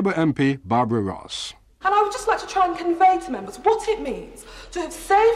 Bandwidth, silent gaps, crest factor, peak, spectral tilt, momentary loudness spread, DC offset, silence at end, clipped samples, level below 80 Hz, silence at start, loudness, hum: 13.5 kHz; none; 14 dB; -8 dBFS; -5.5 dB/octave; 13 LU; under 0.1%; 0 s; under 0.1%; -48 dBFS; 0 s; -22 LUFS; none